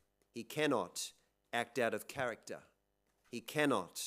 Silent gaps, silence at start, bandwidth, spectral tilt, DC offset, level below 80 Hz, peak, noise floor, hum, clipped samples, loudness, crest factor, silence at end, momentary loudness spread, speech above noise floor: none; 0.35 s; 16 kHz; -3.5 dB/octave; under 0.1%; -80 dBFS; -18 dBFS; -81 dBFS; none; under 0.1%; -38 LUFS; 22 dB; 0 s; 16 LU; 42 dB